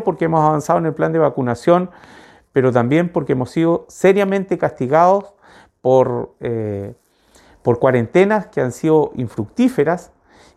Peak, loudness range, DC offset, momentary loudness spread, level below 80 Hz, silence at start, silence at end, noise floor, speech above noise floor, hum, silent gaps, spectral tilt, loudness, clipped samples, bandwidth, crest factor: 0 dBFS; 2 LU; under 0.1%; 9 LU; -54 dBFS; 0 s; 0.55 s; -52 dBFS; 36 dB; none; none; -7.5 dB/octave; -17 LUFS; under 0.1%; 13.5 kHz; 16 dB